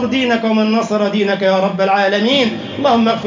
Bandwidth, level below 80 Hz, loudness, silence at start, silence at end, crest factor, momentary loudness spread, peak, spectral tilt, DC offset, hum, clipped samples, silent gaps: 7.6 kHz; -54 dBFS; -14 LUFS; 0 s; 0 s; 12 dB; 3 LU; -2 dBFS; -5.5 dB/octave; under 0.1%; none; under 0.1%; none